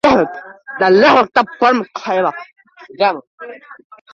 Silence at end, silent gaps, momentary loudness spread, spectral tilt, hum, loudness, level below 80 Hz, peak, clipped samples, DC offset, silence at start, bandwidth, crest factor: 0.4 s; 3.27-3.38 s; 23 LU; -5.5 dB/octave; none; -14 LUFS; -54 dBFS; 0 dBFS; under 0.1%; under 0.1%; 0.05 s; 8.6 kHz; 14 dB